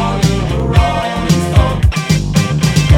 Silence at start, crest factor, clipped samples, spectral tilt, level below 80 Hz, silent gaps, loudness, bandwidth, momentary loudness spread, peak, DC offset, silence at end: 0 s; 12 dB; 0.3%; -6 dB/octave; -18 dBFS; none; -13 LUFS; 16.5 kHz; 3 LU; 0 dBFS; under 0.1%; 0 s